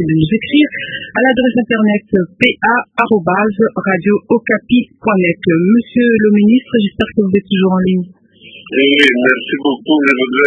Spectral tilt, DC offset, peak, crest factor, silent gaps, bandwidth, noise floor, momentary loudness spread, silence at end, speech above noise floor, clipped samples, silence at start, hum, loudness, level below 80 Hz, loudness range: -7 dB/octave; under 0.1%; 0 dBFS; 12 dB; none; 8.2 kHz; -38 dBFS; 6 LU; 0 s; 26 dB; under 0.1%; 0 s; none; -12 LUFS; -46 dBFS; 1 LU